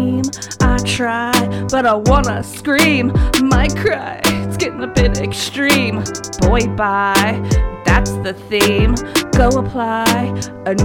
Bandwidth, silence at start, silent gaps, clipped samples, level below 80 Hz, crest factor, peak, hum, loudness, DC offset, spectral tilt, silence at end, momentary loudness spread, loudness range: 19 kHz; 0 s; none; under 0.1%; -22 dBFS; 14 dB; 0 dBFS; none; -15 LUFS; under 0.1%; -5 dB/octave; 0 s; 7 LU; 2 LU